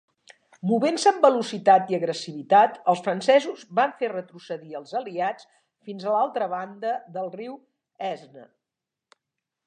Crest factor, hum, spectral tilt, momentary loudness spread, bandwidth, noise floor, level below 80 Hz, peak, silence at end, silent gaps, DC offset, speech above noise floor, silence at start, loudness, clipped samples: 22 dB; none; -4.5 dB/octave; 16 LU; 10 kHz; -87 dBFS; -82 dBFS; -2 dBFS; 1.25 s; none; under 0.1%; 64 dB; 0.65 s; -24 LUFS; under 0.1%